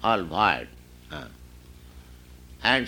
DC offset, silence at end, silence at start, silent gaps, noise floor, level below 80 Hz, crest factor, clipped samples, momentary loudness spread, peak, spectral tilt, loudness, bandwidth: under 0.1%; 0 s; 0 s; none; -48 dBFS; -48 dBFS; 24 dB; under 0.1%; 26 LU; -4 dBFS; -4.5 dB/octave; -24 LUFS; 19.5 kHz